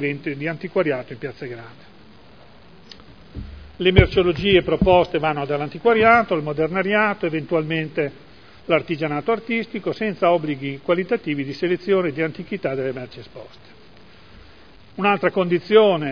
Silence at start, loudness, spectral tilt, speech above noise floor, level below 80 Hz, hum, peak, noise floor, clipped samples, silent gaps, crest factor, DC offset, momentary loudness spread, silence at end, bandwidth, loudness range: 0 s; -20 LUFS; -8 dB/octave; 28 dB; -38 dBFS; none; 0 dBFS; -48 dBFS; under 0.1%; none; 22 dB; 0.4%; 18 LU; 0 s; 5.4 kHz; 9 LU